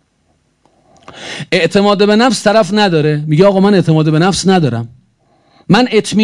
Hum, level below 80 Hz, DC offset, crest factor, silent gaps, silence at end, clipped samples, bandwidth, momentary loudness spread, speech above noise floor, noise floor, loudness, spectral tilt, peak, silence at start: none; -48 dBFS; under 0.1%; 12 dB; none; 0 s; 0.5%; 11.5 kHz; 11 LU; 48 dB; -58 dBFS; -11 LUFS; -5.5 dB/octave; 0 dBFS; 1.15 s